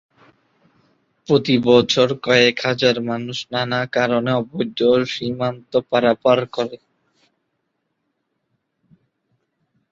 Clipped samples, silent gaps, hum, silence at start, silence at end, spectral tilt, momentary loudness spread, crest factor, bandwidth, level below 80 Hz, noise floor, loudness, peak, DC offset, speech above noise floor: under 0.1%; none; none; 1.3 s; 3.15 s; -5 dB/octave; 10 LU; 20 dB; 7.4 kHz; -60 dBFS; -73 dBFS; -18 LUFS; -2 dBFS; under 0.1%; 55 dB